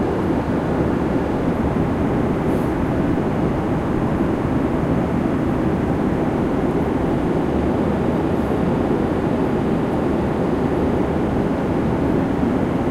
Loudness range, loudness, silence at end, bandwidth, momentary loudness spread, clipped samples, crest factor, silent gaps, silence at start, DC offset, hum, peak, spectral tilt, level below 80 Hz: 0 LU; -20 LUFS; 0 s; 14 kHz; 1 LU; under 0.1%; 12 dB; none; 0 s; under 0.1%; none; -6 dBFS; -8.5 dB/octave; -32 dBFS